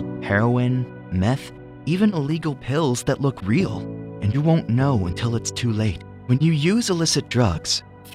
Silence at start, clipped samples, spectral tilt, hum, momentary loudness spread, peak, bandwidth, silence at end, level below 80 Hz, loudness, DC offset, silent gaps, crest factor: 0 s; under 0.1%; -5.5 dB/octave; none; 7 LU; -6 dBFS; 14.5 kHz; 0 s; -46 dBFS; -22 LUFS; under 0.1%; none; 16 dB